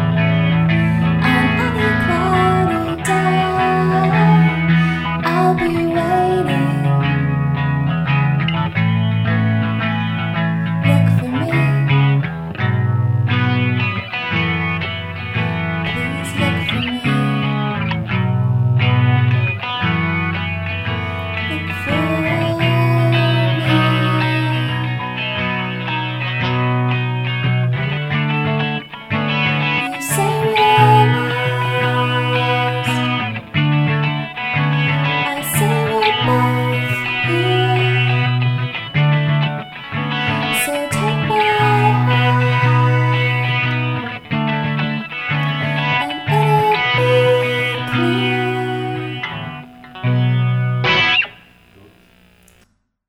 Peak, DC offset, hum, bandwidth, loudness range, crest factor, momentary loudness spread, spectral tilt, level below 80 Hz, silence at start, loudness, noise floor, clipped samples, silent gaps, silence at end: 0 dBFS; under 0.1%; none; 15.5 kHz; 4 LU; 16 dB; 7 LU; -6 dB/octave; -44 dBFS; 0 s; -17 LUFS; -58 dBFS; under 0.1%; none; 1.75 s